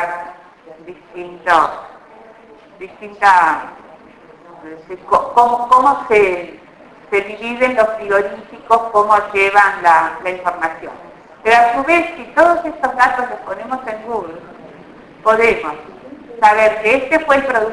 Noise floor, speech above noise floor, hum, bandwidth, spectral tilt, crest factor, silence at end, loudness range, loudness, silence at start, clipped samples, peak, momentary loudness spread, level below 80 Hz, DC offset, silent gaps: -42 dBFS; 27 dB; none; 11 kHz; -4 dB/octave; 16 dB; 0 s; 4 LU; -14 LUFS; 0 s; under 0.1%; 0 dBFS; 21 LU; -50 dBFS; under 0.1%; none